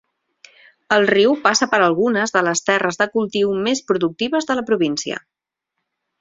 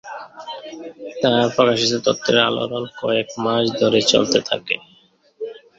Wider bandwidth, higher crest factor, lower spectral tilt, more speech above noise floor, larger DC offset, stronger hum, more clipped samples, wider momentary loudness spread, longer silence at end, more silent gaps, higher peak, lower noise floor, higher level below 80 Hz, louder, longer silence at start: about the same, 8 kHz vs 7.8 kHz; about the same, 18 dB vs 20 dB; about the same, -3.5 dB/octave vs -3.5 dB/octave; first, 62 dB vs 36 dB; neither; neither; neither; second, 6 LU vs 18 LU; first, 1 s vs 0.2 s; neither; about the same, 0 dBFS vs 0 dBFS; first, -79 dBFS vs -55 dBFS; about the same, -60 dBFS vs -60 dBFS; about the same, -18 LUFS vs -18 LUFS; first, 0.9 s vs 0.05 s